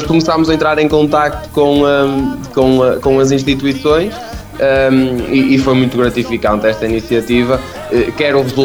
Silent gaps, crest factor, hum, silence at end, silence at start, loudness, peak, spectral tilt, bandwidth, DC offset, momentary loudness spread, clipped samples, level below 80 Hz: none; 12 dB; none; 0 s; 0 s; -12 LUFS; 0 dBFS; -6 dB/octave; over 20 kHz; under 0.1%; 6 LU; under 0.1%; -32 dBFS